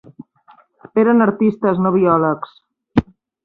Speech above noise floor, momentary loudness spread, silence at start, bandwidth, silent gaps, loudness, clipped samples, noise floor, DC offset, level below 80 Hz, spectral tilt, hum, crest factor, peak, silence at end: 36 dB; 8 LU; 0.2 s; 5 kHz; none; -16 LUFS; under 0.1%; -51 dBFS; under 0.1%; -46 dBFS; -10.5 dB/octave; none; 16 dB; -2 dBFS; 0.4 s